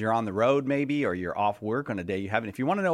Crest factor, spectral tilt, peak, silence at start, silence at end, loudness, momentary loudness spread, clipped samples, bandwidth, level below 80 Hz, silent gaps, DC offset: 18 dB; -7 dB/octave; -8 dBFS; 0 s; 0 s; -28 LUFS; 6 LU; under 0.1%; 14 kHz; -64 dBFS; none; under 0.1%